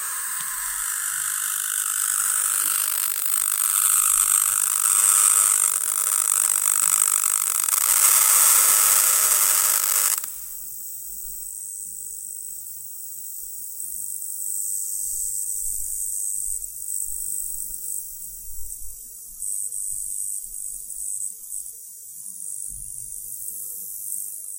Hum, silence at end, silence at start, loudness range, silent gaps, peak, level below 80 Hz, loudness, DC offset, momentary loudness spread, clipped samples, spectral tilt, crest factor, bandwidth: none; 0 s; 0 s; 15 LU; none; -2 dBFS; -54 dBFS; -19 LUFS; under 0.1%; 17 LU; under 0.1%; 3.5 dB/octave; 22 dB; 18 kHz